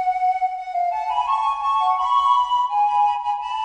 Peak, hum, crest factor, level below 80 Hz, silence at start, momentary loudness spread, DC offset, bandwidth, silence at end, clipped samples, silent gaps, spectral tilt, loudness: -8 dBFS; none; 12 dB; -58 dBFS; 0 s; 6 LU; under 0.1%; 9.6 kHz; 0 s; under 0.1%; none; 0.5 dB/octave; -20 LUFS